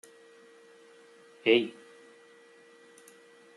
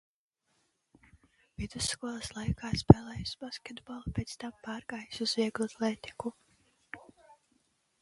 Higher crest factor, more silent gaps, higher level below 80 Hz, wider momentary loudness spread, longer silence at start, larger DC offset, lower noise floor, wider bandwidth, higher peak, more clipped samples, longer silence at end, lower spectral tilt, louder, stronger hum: second, 24 dB vs 34 dB; neither; second, -84 dBFS vs -48 dBFS; first, 29 LU vs 21 LU; second, 1.45 s vs 1.6 s; neither; second, -57 dBFS vs -76 dBFS; about the same, 12 kHz vs 11.5 kHz; second, -10 dBFS vs 0 dBFS; neither; first, 1.85 s vs 1.05 s; about the same, -4.5 dB/octave vs -5.5 dB/octave; first, -27 LUFS vs -32 LUFS; neither